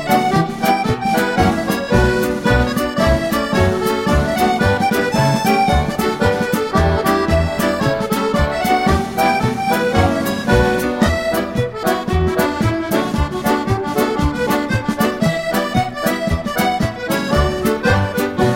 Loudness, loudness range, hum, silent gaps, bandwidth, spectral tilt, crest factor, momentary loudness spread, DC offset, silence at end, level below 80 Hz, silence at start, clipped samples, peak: -17 LUFS; 2 LU; none; none; 16.5 kHz; -5.5 dB/octave; 14 dB; 4 LU; under 0.1%; 0 s; -28 dBFS; 0 s; under 0.1%; -2 dBFS